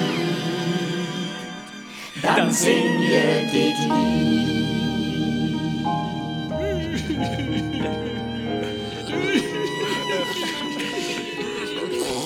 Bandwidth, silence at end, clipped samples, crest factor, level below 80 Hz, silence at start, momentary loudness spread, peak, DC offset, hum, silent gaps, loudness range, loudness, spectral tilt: 17.5 kHz; 0 s; under 0.1%; 18 dB; -46 dBFS; 0 s; 9 LU; -4 dBFS; under 0.1%; none; none; 5 LU; -23 LUFS; -4.5 dB/octave